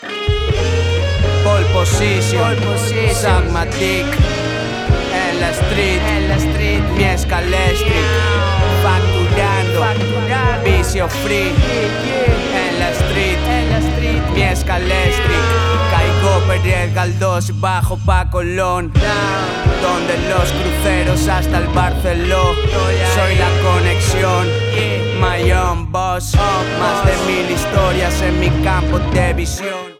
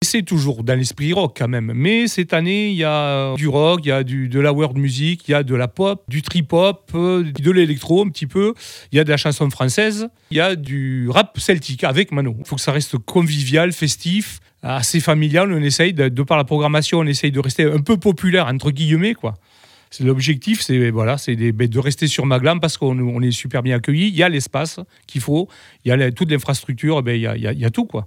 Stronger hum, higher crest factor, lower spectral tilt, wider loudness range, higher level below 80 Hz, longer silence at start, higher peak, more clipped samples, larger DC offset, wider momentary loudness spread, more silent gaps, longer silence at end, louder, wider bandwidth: neither; about the same, 14 dB vs 18 dB; about the same, -5 dB/octave vs -5.5 dB/octave; about the same, 1 LU vs 2 LU; first, -22 dBFS vs -52 dBFS; about the same, 0 s vs 0 s; about the same, 0 dBFS vs 0 dBFS; neither; neither; second, 3 LU vs 6 LU; neither; about the same, 0.05 s vs 0 s; first, -15 LUFS vs -18 LUFS; about the same, 16 kHz vs 16.5 kHz